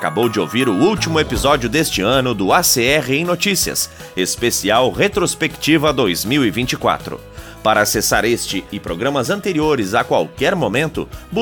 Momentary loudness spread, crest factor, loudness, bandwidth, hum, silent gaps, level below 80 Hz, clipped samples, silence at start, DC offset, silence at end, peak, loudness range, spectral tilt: 7 LU; 16 dB; -16 LUFS; over 20 kHz; none; none; -38 dBFS; under 0.1%; 0 s; under 0.1%; 0 s; -2 dBFS; 3 LU; -3.5 dB/octave